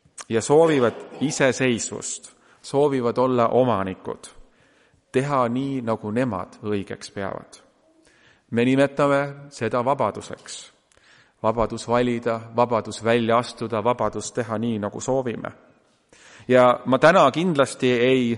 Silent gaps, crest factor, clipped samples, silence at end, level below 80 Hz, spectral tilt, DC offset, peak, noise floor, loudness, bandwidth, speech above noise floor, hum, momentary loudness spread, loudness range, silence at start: none; 20 dB; under 0.1%; 0 s; -54 dBFS; -5.5 dB/octave; under 0.1%; -2 dBFS; -59 dBFS; -22 LUFS; 11.5 kHz; 38 dB; none; 15 LU; 6 LU; 0.2 s